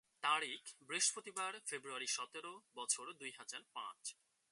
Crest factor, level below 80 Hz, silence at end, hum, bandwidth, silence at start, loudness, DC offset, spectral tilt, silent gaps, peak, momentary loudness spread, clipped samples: 22 dB; under -90 dBFS; 0.4 s; none; 11.5 kHz; 0.2 s; -42 LUFS; under 0.1%; 1 dB/octave; none; -22 dBFS; 14 LU; under 0.1%